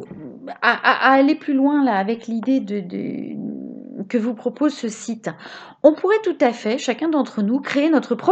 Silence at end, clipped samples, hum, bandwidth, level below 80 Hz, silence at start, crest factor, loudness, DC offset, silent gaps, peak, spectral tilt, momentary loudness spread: 0 s; under 0.1%; none; 8.6 kHz; -72 dBFS; 0 s; 20 dB; -20 LUFS; under 0.1%; none; 0 dBFS; -5 dB/octave; 16 LU